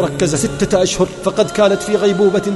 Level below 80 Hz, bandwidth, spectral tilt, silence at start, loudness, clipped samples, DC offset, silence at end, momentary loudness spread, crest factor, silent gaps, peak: -38 dBFS; 12 kHz; -4.5 dB/octave; 0 s; -15 LUFS; under 0.1%; under 0.1%; 0 s; 4 LU; 14 dB; none; -2 dBFS